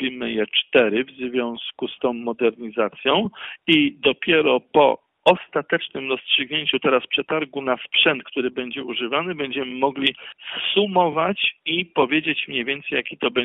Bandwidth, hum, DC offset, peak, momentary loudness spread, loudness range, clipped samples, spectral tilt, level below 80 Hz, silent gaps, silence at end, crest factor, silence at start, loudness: 4.3 kHz; none; under 0.1%; -2 dBFS; 8 LU; 3 LU; under 0.1%; -1.5 dB/octave; -62 dBFS; none; 0 s; 18 dB; 0 s; -21 LUFS